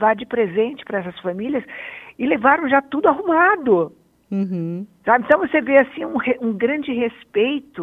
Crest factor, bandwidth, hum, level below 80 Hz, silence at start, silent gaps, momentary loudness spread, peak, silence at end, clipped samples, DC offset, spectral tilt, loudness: 18 dB; 4.7 kHz; none; -60 dBFS; 0 s; none; 11 LU; 0 dBFS; 0 s; under 0.1%; under 0.1%; -8.5 dB/octave; -19 LUFS